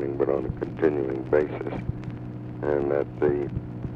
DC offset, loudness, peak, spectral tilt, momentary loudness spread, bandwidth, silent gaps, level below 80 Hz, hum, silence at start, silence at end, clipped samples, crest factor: under 0.1%; -27 LUFS; -10 dBFS; -10 dB/octave; 10 LU; 5.6 kHz; none; -46 dBFS; none; 0 s; 0 s; under 0.1%; 18 dB